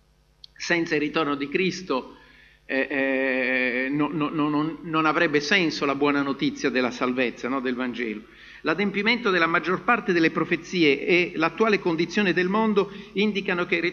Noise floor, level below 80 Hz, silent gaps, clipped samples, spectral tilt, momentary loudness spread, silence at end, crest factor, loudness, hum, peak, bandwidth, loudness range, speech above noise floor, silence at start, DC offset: -53 dBFS; -60 dBFS; none; under 0.1%; -5 dB/octave; 7 LU; 0 s; 20 dB; -23 LUFS; none; -4 dBFS; 7.2 kHz; 4 LU; 30 dB; 0.6 s; under 0.1%